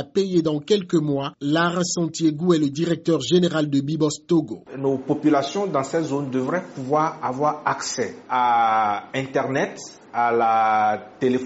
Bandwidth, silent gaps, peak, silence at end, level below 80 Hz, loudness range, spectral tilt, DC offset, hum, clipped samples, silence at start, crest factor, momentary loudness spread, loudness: 8 kHz; none; -6 dBFS; 0 s; -64 dBFS; 2 LU; -5 dB/octave; under 0.1%; none; under 0.1%; 0 s; 16 dB; 7 LU; -22 LUFS